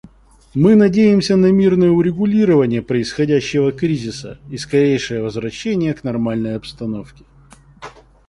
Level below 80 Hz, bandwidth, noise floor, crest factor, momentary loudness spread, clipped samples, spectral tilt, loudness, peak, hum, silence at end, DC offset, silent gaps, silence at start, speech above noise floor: -46 dBFS; 11.5 kHz; -46 dBFS; 14 dB; 14 LU; under 0.1%; -7 dB/octave; -16 LUFS; -2 dBFS; none; 0.4 s; under 0.1%; none; 0.55 s; 30 dB